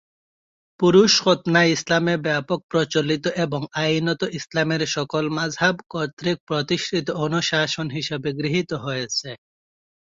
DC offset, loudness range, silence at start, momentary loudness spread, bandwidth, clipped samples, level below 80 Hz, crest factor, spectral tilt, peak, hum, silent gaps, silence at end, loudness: under 0.1%; 5 LU; 0.8 s; 9 LU; 7.8 kHz; under 0.1%; -60 dBFS; 20 dB; -4.5 dB/octave; -4 dBFS; none; 2.63-2.69 s, 6.13-6.17 s, 6.40-6.47 s; 0.8 s; -21 LUFS